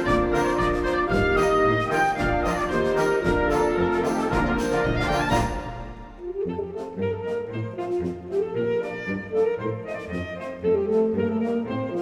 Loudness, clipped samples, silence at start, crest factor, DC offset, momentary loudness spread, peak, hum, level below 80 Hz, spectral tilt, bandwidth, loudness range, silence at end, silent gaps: -24 LUFS; under 0.1%; 0 s; 16 dB; under 0.1%; 10 LU; -8 dBFS; none; -38 dBFS; -6.5 dB/octave; 18 kHz; 6 LU; 0 s; none